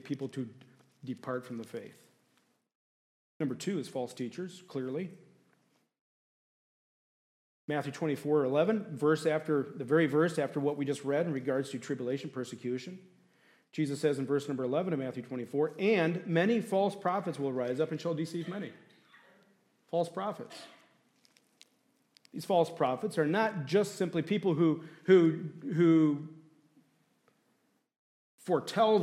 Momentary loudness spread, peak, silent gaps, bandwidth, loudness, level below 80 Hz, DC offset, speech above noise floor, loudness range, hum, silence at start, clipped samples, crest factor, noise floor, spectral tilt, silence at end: 14 LU; -12 dBFS; 2.75-3.40 s, 6.01-7.68 s, 27.99-28.38 s; 14 kHz; -32 LUFS; -84 dBFS; under 0.1%; 43 dB; 12 LU; none; 0.05 s; under 0.1%; 20 dB; -75 dBFS; -6.5 dB/octave; 0 s